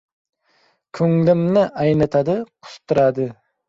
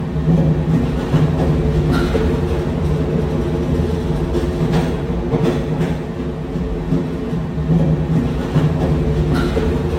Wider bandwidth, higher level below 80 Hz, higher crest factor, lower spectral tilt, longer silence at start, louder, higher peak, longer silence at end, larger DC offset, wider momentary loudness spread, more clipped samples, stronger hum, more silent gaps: second, 7.6 kHz vs 10 kHz; second, -54 dBFS vs -26 dBFS; about the same, 16 dB vs 14 dB; about the same, -8.5 dB/octave vs -8.5 dB/octave; first, 0.95 s vs 0 s; about the same, -18 LUFS vs -18 LUFS; about the same, -4 dBFS vs -4 dBFS; first, 0.35 s vs 0 s; neither; first, 11 LU vs 6 LU; neither; neither; neither